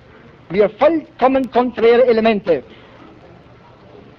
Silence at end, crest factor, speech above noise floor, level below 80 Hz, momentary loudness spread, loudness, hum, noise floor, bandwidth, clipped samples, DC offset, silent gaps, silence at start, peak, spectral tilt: 1.55 s; 16 dB; 29 dB; -50 dBFS; 7 LU; -15 LUFS; none; -44 dBFS; 6 kHz; under 0.1%; under 0.1%; none; 0.5 s; -2 dBFS; -7.5 dB/octave